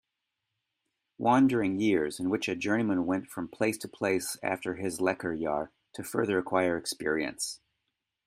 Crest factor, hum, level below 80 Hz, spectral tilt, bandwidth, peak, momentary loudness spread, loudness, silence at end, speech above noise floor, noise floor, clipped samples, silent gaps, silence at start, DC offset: 20 dB; none; -68 dBFS; -4.5 dB/octave; 15.5 kHz; -10 dBFS; 9 LU; -30 LUFS; 0.7 s; 55 dB; -85 dBFS; under 0.1%; none; 1.2 s; under 0.1%